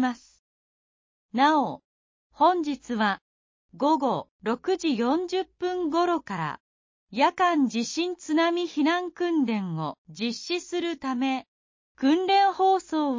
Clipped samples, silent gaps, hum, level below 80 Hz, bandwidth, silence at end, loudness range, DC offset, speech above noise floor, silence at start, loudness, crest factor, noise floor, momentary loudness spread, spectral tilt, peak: under 0.1%; 0.39-1.29 s, 1.85-2.30 s, 3.21-3.69 s, 4.31-4.39 s, 6.60-7.07 s, 9.98-10.05 s, 11.48-11.95 s; none; -70 dBFS; 7.6 kHz; 0 s; 2 LU; under 0.1%; over 65 dB; 0 s; -26 LUFS; 16 dB; under -90 dBFS; 11 LU; -4.5 dB/octave; -10 dBFS